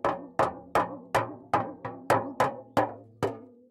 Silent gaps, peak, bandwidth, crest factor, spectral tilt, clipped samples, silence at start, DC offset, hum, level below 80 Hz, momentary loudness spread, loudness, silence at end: none; -10 dBFS; 16 kHz; 20 dB; -5.5 dB/octave; under 0.1%; 0.05 s; under 0.1%; none; -62 dBFS; 7 LU; -30 LUFS; 0.2 s